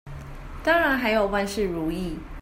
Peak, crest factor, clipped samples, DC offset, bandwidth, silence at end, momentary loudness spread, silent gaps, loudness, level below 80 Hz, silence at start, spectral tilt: -10 dBFS; 16 dB; under 0.1%; under 0.1%; 16 kHz; 0 s; 20 LU; none; -24 LUFS; -40 dBFS; 0.05 s; -5 dB/octave